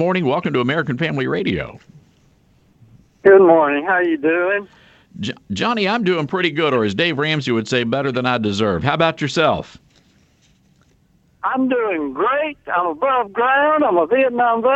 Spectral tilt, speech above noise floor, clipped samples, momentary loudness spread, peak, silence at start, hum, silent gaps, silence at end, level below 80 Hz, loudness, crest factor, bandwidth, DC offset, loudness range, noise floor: -6 dB/octave; 40 dB; under 0.1%; 8 LU; 0 dBFS; 0 s; none; none; 0 s; -52 dBFS; -17 LUFS; 18 dB; 8.2 kHz; under 0.1%; 5 LU; -57 dBFS